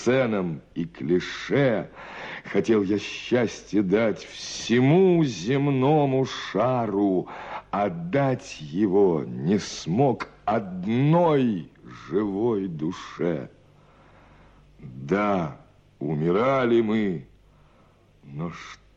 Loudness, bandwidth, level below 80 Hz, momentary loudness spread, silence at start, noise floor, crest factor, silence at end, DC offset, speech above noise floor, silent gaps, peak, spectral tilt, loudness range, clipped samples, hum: -24 LUFS; 8.6 kHz; -58 dBFS; 14 LU; 0 s; -57 dBFS; 14 dB; 0.2 s; under 0.1%; 33 dB; none; -10 dBFS; -6.5 dB/octave; 7 LU; under 0.1%; none